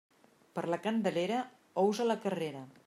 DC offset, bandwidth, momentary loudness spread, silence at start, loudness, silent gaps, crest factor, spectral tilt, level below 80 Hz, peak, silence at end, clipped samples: under 0.1%; 15 kHz; 10 LU; 0.55 s; -34 LUFS; none; 16 dB; -5.5 dB/octave; -84 dBFS; -18 dBFS; 0.15 s; under 0.1%